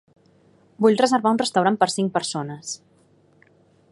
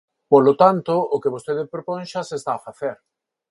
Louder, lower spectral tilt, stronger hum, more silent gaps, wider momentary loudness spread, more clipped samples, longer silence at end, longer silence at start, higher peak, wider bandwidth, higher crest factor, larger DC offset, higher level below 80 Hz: about the same, -21 LUFS vs -20 LUFS; second, -4.5 dB/octave vs -7 dB/octave; neither; neither; about the same, 14 LU vs 14 LU; neither; first, 1.15 s vs 0.55 s; first, 0.8 s vs 0.3 s; about the same, -2 dBFS vs 0 dBFS; about the same, 11.5 kHz vs 11.5 kHz; about the same, 20 dB vs 20 dB; neither; second, -72 dBFS vs -66 dBFS